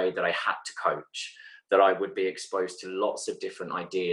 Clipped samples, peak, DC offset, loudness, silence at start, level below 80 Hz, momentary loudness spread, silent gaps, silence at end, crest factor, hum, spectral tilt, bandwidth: under 0.1%; -8 dBFS; under 0.1%; -29 LUFS; 0 s; -78 dBFS; 14 LU; none; 0 s; 22 dB; none; -3 dB/octave; 11.5 kHz